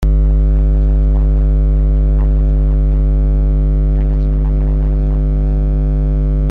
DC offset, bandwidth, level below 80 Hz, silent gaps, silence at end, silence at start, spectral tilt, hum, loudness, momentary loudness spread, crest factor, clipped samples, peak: under 0.1%; 2.1 kHz; -12 dBFS; none; 0 s; 0 s; -11 dB/octave; none; -15 LUFS; 2 LU; 6 dB; under 0.1%; -4 dBFS